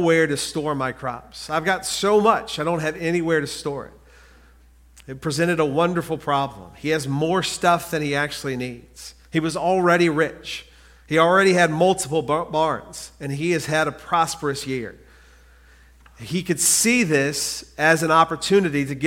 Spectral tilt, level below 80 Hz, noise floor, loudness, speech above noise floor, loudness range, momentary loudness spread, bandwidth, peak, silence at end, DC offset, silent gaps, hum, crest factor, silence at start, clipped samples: -4 dB/octave; -52 dBFS; -51 dBFS; -21 LUFS; 30 dB; 6 LU; 14 LU; 16.5 kHz; -2 dBFS; 0 s; under 0.1%; none; none; 20 dB; 0 s; under 0.1%